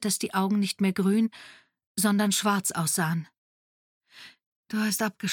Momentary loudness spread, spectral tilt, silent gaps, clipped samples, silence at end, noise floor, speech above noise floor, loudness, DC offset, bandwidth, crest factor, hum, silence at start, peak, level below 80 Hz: 8 LU; -4 dB/octave; 1.86-1.95 s, 3.38-4.01 s, 4.46-4.63 s; under 0.1%; 0 s; under -90 dBFS; over 64 dB; -26 LUFS; under 0.1%; 17.5 kHz; 16 dB; none; 0 s; -12 dBFS; -74 dBFS